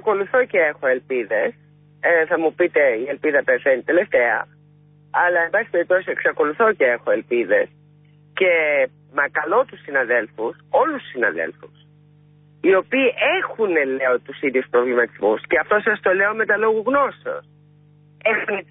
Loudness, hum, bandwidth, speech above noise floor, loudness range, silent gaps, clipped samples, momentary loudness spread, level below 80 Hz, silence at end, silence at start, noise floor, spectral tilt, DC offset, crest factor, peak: -19 LUFS; 50 Hz at -50 dBFS; 3.9 kHz; 32 dB; 2 LU; none; under 0.1%; 6 LU; -66 dBFS; 0.1 s; 0.05 s; -51 dBFS; -9.5 dB/octave; under 0.1%; 14 dB; -6 dBFS